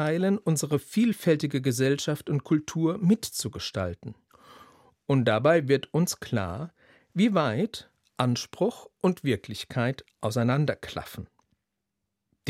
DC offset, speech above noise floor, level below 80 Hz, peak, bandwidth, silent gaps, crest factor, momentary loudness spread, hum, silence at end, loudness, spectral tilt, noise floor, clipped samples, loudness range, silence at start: under 0.1%; 57 dB; -64 dBFS; -8 dBFS; 16 kHz; none; 20 dB; 13 LU; none; 0 s; -27 LUFS; -6 dB/octave; -83 dBFS; under 0.1%; 3 LU; 0 s